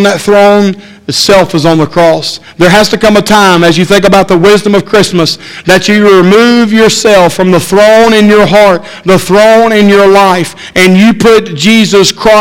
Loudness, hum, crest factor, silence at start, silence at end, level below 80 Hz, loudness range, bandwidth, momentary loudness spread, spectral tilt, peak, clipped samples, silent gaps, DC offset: -5 LUFS; none; 4 dB; 0 s; 0 s; -34 dBFS; 2 LU; 17 kHz; 6 LU; -4.5 dB/octave; 0 dBFS; 7%; none; under 0.1%